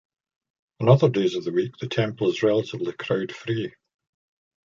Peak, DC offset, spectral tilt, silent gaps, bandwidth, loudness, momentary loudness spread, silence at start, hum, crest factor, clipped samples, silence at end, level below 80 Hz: -2 dBFS; under 0.1%; -7.5 dB/octave; none; 7.4 kHz; -24 LUFS; 11 LU; 0.8 s; none; 22 dB; under 0.1%; 0.95 s; -64 dBFS